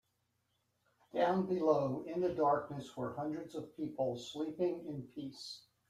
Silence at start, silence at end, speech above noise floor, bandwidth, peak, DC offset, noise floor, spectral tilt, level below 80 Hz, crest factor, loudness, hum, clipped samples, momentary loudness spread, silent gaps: 1.15 s; 0.3 s; 45 dB; 13.5 kHz; -18 dBFS; under 0.1%; -81 dBFS; -6.5 dB/octave; -76 dBFS; 20 dB; -37 LUFS; none; under 0.1%; 14 LU; none